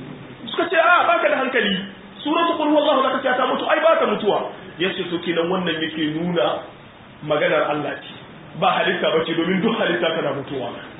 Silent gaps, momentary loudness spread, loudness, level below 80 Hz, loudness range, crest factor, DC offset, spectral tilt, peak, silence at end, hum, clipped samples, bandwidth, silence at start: none; 13 LU; -20 LUFS; -60 dBFS; 4 LU; 18 dB; under 0.1%; -10 dB/octave; -2 dBFS; 0 s; none; under 0.1%; 4 kHz; 0 s